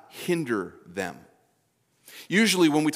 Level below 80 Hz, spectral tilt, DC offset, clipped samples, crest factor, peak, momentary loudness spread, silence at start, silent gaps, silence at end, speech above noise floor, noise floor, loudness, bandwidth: -78 dBFS; -4 dB/octave; under 0.1%; under 0.1%; 18 dB; -8 dBFS; 16 LU; 0.15 s; none; 0 s; 45 dB; -70 dBFS; -25 LUFS; 16 kHz